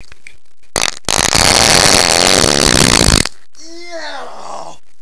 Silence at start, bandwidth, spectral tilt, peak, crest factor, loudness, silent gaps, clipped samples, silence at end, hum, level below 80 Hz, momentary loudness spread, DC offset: 0 s; 11 kHz; -2 dB/octave; 0 dBFS; 14 dB; -9 LUFS; none; 0.9%; 0 s; none; -28 dBFS; 22 LU; 4%